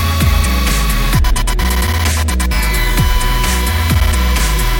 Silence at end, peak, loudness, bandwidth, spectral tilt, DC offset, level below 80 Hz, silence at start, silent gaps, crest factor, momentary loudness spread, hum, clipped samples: 0 s; -2 dBFS; -14 LUFS; 17 kHz; -4 dB/octave; under 0.1%; -14 dBFS; 0 s; none; 12 dB; 2 LU; none; under 0.1%